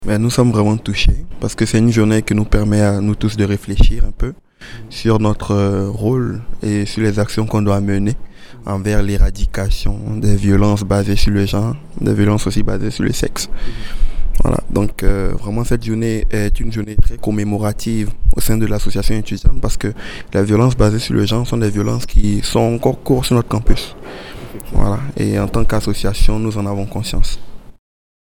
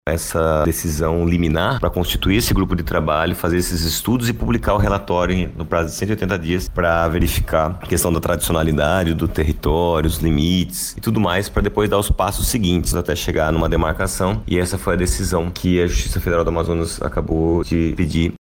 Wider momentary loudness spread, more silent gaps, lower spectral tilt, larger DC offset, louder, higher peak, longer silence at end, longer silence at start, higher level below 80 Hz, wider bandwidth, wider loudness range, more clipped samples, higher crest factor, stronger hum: first, 10 LU vs 4 LU; neither; first, -6.5 dB/octave vs -5 dB/octave; neither; about the same, -17 LUFS vs -19 LUFS; first, 0 dBFS vs -4 dBFS; first, 0.6 s vs 0.1 s; about the same, 0 s vs 0.05 s; first, -20 dBFS vs -26 dBFS; about the same, 15.5 kHz vs 17 kHz; first, 4 LU vs 1 LU; first, 0.2% vs under 0.1%; about the same, 14 dB vs 14 dB; neither